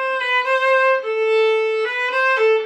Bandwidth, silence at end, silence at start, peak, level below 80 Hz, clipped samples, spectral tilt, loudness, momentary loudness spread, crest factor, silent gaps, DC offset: 8.8 kHz; 0 s; 0 s; -6 dBFS; -80 dBFS; under 0.1%; 0.5 dB/octave; -17 LUFS; 4 LU; 12 dB; none; under 0.1%